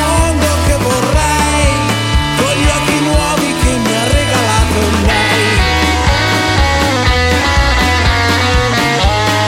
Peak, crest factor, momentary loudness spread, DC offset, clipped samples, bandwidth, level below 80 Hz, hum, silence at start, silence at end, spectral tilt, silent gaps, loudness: 0 dBFS; 12 dB; 2 LU; under 0.1%; under 0.1%; 16.5 kHz; -18 dBFS; none; 0 s; 0 s; -4 dB/octave; none; -11 LUFS